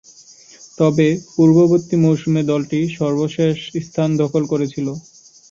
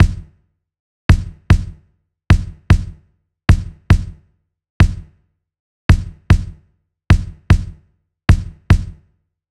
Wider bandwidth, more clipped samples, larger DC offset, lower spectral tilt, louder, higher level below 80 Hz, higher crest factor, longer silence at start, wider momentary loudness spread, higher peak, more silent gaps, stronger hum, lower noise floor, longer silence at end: second, 7.6 kHz vs 11 kHz; neither; neither; about the same, -7.5 dB/octave vs -7 dB/octave; about the same, -17 LUFS vs -17 LUFS; second, -56 dBFS vs -20 dBFS; about the same, 14 dB vs 16 dB; first, 0.8 s vs 0 s; second, 10 LU vs 17 LU; about the same, -2 dBFS vs 0 dBFS; second, none vs 0.79-1.09 s, 4.70-4.80 s, 5.59-5.89 s; neither; second, -45 dBFS vs -61 dBFS; second, 0.5 s vs 0.65 s